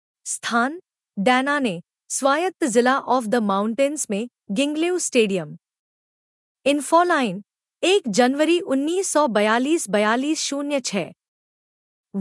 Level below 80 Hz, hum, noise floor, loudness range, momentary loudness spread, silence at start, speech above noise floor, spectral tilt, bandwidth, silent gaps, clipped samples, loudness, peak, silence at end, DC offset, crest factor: -76 dBFS; none; under -90 dBFS; 3 LU; 10 LU; 0.25 s; over 70 dB; -3.5 dB/octave; 12 kHz; 5.79-6.55 s, 11.28-12.04 s; under 0.1%; -21 LUFS; -4 dBFS; 0 s; under 0.1%; 18 dB